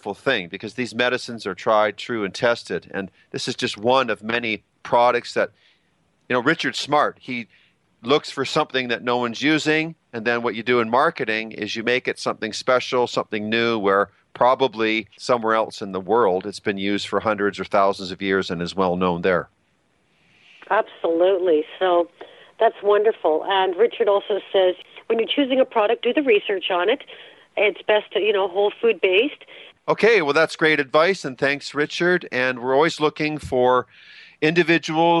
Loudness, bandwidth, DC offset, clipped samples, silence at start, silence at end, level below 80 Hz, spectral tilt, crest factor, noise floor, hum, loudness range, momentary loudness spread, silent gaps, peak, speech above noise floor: -21 LUFS; 11.5 kHz; under 0.1%; under 0.1%; 0.05 s; 0 s; -62 dBFS; -4.5 dB/octave; 18 dB; -65 dBFS; none; 4 LU; 9 LU; none; -2 dBFS; 44 dB